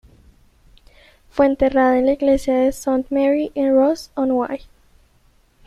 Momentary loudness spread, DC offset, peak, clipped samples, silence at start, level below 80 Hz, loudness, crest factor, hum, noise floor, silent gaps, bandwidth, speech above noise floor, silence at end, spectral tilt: 7 LU; under 0.1%; -2 dBFS; under 0.1%; 1.35 s; -44 dBFS; -18 LUFS; 16 dB; none; -56 dBFS; none; 13.5 kHz; 39 dB; 1.1 s; -5.5 dB/octave